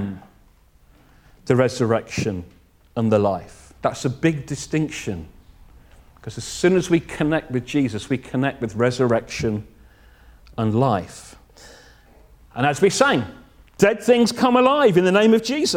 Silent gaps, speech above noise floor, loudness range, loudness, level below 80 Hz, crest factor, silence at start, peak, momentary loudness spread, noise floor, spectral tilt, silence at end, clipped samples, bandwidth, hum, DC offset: none; 34 dB; 7 LU; -20 LUFS; -50 dBFS; 20 dB; 0 s; -2 dBFS; 17 LU; -54 dBFS; -5.5 dB/octave; 0 s; under 0.1%; 16.5 kHz; none; under 0.1%